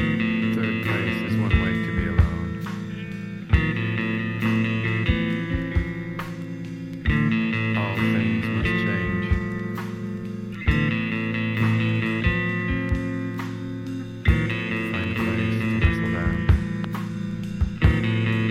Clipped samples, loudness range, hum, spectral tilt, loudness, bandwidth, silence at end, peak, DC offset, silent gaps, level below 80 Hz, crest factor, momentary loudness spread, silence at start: under 0.1%; 1 LU; none; -7.5 dB/octave; -24 LUFS; 14 kHz; 0 s; -4 dBFS; under 0.1%; none; -32 dBFS; 20 dB; 9 LU; 0 s